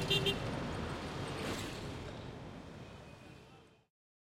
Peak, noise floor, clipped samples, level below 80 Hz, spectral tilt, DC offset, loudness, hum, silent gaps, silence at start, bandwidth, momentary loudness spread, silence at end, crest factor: -18 dBFS; -60 dBFS; under 0.1%; -56 dBFS; -4.5 dB/octave; under 0.1%; -40 LUFS; none; none; 0 s; 16.5 kHz; 20 LU; 0.5 s; 22 dB